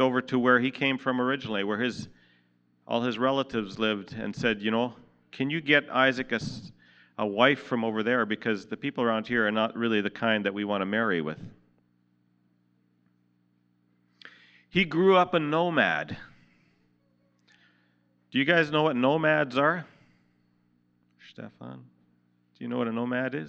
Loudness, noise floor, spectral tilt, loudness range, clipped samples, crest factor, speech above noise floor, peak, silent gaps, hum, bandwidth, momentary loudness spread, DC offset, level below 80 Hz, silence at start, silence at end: -26 LUFS; -69 dBFS; -6 dB/octave; 7 LU; under 0.1%; 24 dB; 42 dB; -6 dBFS; none; 60 Hz at -60 dBFS; 8.4 kHz; 14 LU; under 0.1%; -68 dBFS; 0 s; 0 s